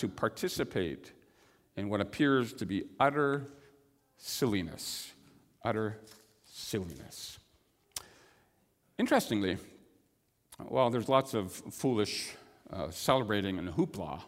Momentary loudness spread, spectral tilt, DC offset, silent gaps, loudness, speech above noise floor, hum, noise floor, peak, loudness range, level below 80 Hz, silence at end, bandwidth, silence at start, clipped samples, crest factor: 17 LU; -5 dB/octave; under 0.1%; none; -33 LUFS; 41 dB; none; -74 dBFS; -10 dBFS; 8 LU; -64 dBFS; 0 s; 16 kHz; 0 s; under 0.1%; 24 dB